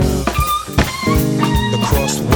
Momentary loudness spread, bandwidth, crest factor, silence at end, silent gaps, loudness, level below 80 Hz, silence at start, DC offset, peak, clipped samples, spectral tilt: 2 LU; over 20 kHz; 14 dB; 0 s; none; -16 LUFS; -24 dBFS; 0 s; under 0.1%; 0 dBFS; under 0.1%; -5 dB/octave